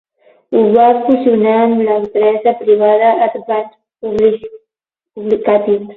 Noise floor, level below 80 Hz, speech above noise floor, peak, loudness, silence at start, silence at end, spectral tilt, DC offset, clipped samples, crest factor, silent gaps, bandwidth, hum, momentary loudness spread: -84 dBFS; -54 dBFS; 72 dB; 0 dBFS; -12 LUFS; 0.5 s; 0 s; -8.5 dB/octave; under 0.1%; under 0.1%; 12 dB; none; 4.2 kHz; none; 11 LU